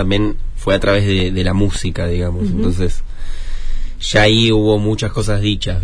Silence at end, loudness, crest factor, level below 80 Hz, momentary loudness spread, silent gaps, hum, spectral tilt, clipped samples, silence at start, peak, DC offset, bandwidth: 0 s; -16 LUFS; 14 dB; -20 dBFS; 17 LU; none; none; -5.5 dB/octave; under 0.1%; 0 s; 0 dBFS; under 0.1%; 10.5 kHz